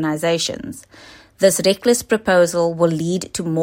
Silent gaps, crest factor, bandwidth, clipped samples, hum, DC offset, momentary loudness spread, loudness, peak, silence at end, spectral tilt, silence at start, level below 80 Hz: none; 16 dB; 16.5 kHz; under 0.1%; none; under 0.1%; 9 LU; -18 LUFS; -2 dBFS; 0 s; -4 dB/octave; 0 s; -54 dBFS